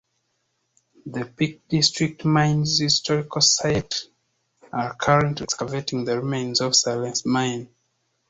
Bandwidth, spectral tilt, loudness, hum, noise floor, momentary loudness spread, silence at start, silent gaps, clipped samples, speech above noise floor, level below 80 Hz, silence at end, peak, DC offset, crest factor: 8.2 kHz; -3.5 dB/octave; -22 LUFS; none; -73 dBFS; 11 LU; 1.05 s; none; under 0.1%; 50 dB; -54 dBFS; 0.65 s; -4 dBFS; under 0.1%; 20 dB